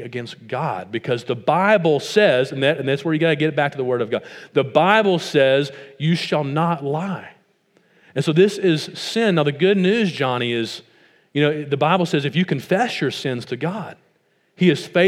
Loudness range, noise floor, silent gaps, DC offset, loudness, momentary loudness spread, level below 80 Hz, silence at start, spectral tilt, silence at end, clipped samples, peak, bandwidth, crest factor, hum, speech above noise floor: 3 LU; -63 dBFS; none; under 0.1%; -19 LUFS; 11 LU; -74 dBFS; 0 s; -6 dB/octave; 0 s; under 0.1%; 0 dBFS; 14 kHz; 20 dB; none; 44 dB